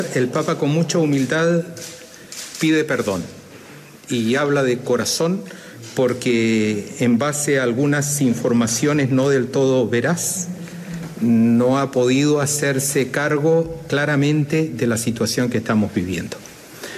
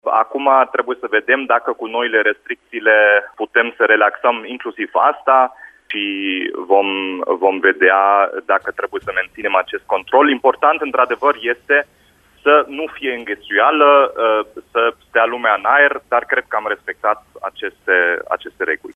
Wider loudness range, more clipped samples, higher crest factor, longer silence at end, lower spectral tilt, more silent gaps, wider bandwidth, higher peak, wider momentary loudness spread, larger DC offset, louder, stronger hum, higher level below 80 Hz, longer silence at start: about the same, 4 LU vs 2 LU; neither; about the same, 12 dB vs 16 dB; about the same, 0 s vs 0.05 s; about the same, -5 dB/octave vs -4.5 dB/octave; neither; first, 14.5 kHz vs 5 kHz; second, -6 dBFS vs 0 dBFS; first, 14 LU vs 11 LU; neither; second, -19 LUFS vs -16 LUFS; neither; first, -56 dBFS vs -62 dBFS; about the same, 0 s vs 0.05 s